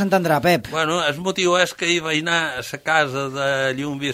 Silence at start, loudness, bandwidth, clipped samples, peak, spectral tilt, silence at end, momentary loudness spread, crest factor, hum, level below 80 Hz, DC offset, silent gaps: 0 s; -20 LUFS; 16 kHz; under 0.1%; -2 dBFS; -4 dB/octave; 0 s; 6 LU; 18 dB; none; -56 dBFS; under 0.1%; none